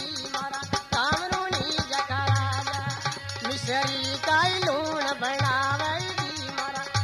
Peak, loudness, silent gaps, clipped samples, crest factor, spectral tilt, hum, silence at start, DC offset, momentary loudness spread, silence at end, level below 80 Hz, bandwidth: -10 dBFS; -26 LUFS; none; under 0.1%; 16 dB; -3.5 dB/octave; none; 0 s; under 0.1%; 7 LU; 0 s; -52 dBFS; 14 kHz